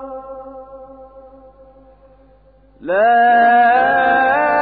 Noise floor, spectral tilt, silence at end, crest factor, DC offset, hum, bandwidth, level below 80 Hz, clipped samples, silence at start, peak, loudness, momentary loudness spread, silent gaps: -49 dBFS; -7.5 dB/octave; 0 s; 14 dB; under 0.1%; 50 Hz at -50 dBFS; 4.8 kHz; -52 dBFS; under 0.1%; 0 s; -4 dBFS; -13 LUFS; 23 LU; none